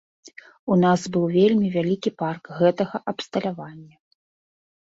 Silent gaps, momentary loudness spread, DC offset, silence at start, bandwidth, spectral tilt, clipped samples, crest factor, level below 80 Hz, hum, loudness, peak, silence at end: 0.59-0.67 s; 12 LU; under 0.1%; 0.25 s; 7.8 kHz; -7 dB/octave; under 0.1%; 18 dB; -64 dBFS; none; -22 LUFS; -6 dBFS; 1 s